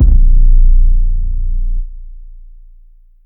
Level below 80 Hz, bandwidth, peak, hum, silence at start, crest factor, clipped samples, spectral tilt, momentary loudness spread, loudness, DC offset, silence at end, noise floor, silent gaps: -10 dBFS; 0.5 kHz; 0 dBFS; none; 0 s; 10 dB; 0.4%; -14 dB/octave; 19 LU; -16 LUFS; under 0.1%; 0.95 s; -41 dBFS; none